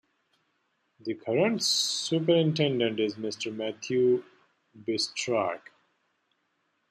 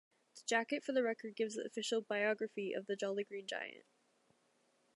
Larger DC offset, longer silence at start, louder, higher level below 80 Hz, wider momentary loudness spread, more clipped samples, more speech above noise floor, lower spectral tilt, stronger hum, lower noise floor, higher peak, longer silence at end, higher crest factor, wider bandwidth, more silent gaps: neither; first, 1.05 s vs 0.35 s; first, -27 LUFS vs -39 LUFS; first, -76 dBFS vs under -90 dBFS; first, 11 LU vs 7 LU; neither; first, 48 dB vs 37 dB; about the same, -4 dB/octave vs -3 dB/octave; neither; about the same, -75 dBFS vs -76 dBFS; first, -12 dBFS vs -20 dBFS; first, 1.35 s vs 1.15 s; about the same, 18 dB vs 20 dB; first, 13.5 kHz vs 11.5 kHz; neither